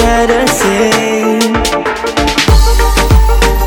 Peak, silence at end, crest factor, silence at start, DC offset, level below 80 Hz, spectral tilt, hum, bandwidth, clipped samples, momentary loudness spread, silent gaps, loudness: 0 dBFS; 0 s; 8 dB; 0 s; under 0.1%; -12 dBFS; -4.5 dB/octave; none; 17.5 kHz; under 0.1%; 4 LU; none; -10 LUFS